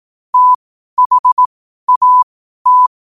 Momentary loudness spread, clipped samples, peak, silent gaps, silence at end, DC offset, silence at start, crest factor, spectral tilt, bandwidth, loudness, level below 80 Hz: 8 LU; under 0.1%; -4 dBFS; 0.55-0.97 s, 1.06-1.10 s, 1.19-1.24 s, 1.32-1.37 s, 1.46-1.87 s, 1.96-2.01 s, 2.23-2.65 s; 0.3 s; under 0.1%; 0.35 s; 8 dB; -1 dB/octave; 1.4 kHz; -12 LUFS; -66 dBFS